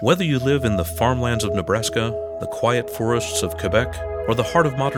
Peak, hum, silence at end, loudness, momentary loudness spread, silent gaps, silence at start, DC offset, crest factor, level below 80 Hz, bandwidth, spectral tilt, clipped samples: -2 dBFS; none; 0 s; -21 LUFS; 6 LU; none; 0 s; under 0.1%; 18 dB; -40 dBFS; 18 kHz; -5 dB/octave; under 0.1%